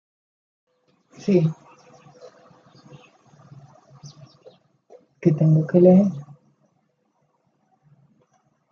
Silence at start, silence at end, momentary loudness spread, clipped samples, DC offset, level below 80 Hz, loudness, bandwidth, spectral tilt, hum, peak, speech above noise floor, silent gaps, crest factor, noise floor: 1.25 s; 2.5 s; 18 LU; under 0.1%; under 0.1%; -70 dBFS; -19 LUFS; 6.8 kHz; -10 dB/octave; none; -2 dBFS; 52 dB; none; 22 dB; -69 dBFS